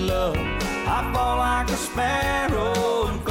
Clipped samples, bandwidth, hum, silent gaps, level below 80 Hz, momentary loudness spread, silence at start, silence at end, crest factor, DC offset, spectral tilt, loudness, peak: under 0.1%; 17 kHz; none; none; -32 dBFS; 3 LU; 0 s; 0 s; 10 dB; under 0.1%; -4.5 dB/octave; -23 LUFS; -12 dBFS